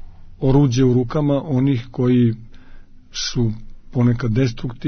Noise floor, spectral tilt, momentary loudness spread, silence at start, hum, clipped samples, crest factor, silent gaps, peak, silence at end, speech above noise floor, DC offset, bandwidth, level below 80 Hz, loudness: -38 dBFS; -7 dB/octave; 10 LU; 0 s; none; under 0.1%; 16 dB; none; -4 dBFS; 0 s; 21 dB; under 0.1%; 6.6 kHz; -34 dBFS; -19 LUFS